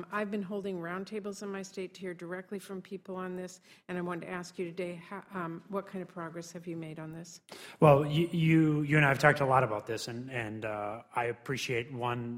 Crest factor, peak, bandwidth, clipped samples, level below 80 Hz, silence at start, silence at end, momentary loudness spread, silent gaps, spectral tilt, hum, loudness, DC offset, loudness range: 24 dB; -8 dBFS; 15.5 kHz; under 0.1%; -66 dBFS; 0 s; 0 s; 17 LU; none; -6.5 dB/octave; none; -32 LUFS; under 0.1%; 13 LU